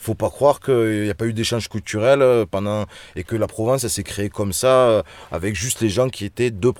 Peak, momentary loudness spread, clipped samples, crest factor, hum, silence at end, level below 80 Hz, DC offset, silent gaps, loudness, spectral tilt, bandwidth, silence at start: -2 dBFS; 11 LU; under 0.1%; 16 dB; none; 0.05 s; -46 dBFS; under 0.1%; none; -20 LUFS; -5 dB/octave; 18 kHz; 0 s